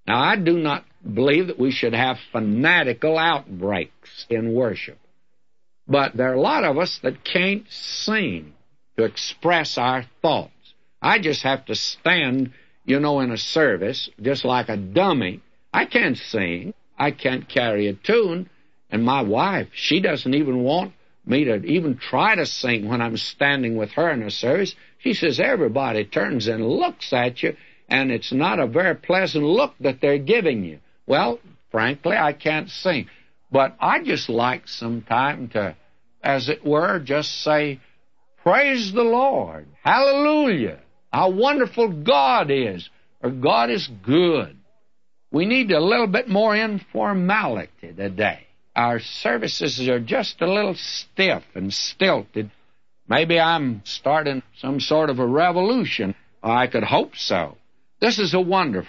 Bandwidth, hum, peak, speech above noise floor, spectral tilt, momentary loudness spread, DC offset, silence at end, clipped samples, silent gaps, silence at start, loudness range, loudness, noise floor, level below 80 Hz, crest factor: 7.8 kHz; none; -4 dBFS; 57 dB; -5.5 dB/octave; 10 LU; 0.2%; 0 s; under 0.1%; none; 0.05 s; 3 LU; -21 LUFS; -78 dBFS; -64 dBFS; 18 dB